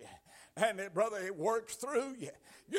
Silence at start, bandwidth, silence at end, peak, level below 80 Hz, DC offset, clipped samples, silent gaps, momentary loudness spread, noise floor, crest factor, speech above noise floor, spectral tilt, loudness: 0 s; 16 kHz; 0 s; -16 dBFS; -78 dBFS; under 0.1%; under 0.1%; none; 16 LU; -58 dBFS; 20 dB; 22 dB; -3.5 dB/octave; -36 LUFS